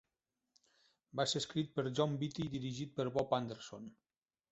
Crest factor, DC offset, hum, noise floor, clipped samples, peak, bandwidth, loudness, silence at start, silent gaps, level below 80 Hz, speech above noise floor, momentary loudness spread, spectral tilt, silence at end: 22 dB; under 0.1%; none; -89 dBFS; under 0.1%; -18 dBFS; 8 kHz; -38 LUFS; 1.15 s; none; -72 dBFS; 51 dB; 13 LU; -5 dB/octave; 0.6 s